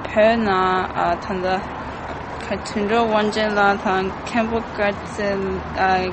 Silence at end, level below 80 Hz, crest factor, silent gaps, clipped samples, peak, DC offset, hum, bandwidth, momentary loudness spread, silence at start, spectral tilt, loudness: 0 s; -42 dBFS; 16 dB; none; under 0.1%; -4 dBFS; under 0.1%; none; 8.8 kHz; 11 LU; 0 s; -5.5 dB/octave; -21 LUFS